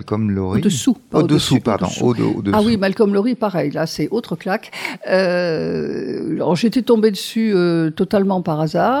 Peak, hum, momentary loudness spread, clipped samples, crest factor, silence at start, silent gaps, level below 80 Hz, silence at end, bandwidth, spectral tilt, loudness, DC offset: -4 dBFS; none; 7 LU; under 0.1%; 14 dB; 0 s; none; -50 dBFS; 0 s; 17 kHz; -6 dB/octave; -18 LUFS; under 0.1%